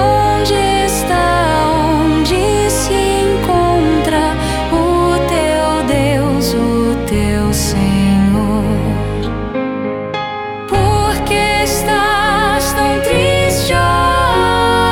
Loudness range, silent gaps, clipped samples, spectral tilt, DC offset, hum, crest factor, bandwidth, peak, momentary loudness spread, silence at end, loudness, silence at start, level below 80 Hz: 3 LU; none; under 0.1%; -5 dB/octave; under 0.1%; none; 12 dB; 18 kHz; -2 dBFS; 6 LU; 0 s; -13 LUFS; 0 s; -24 dBFS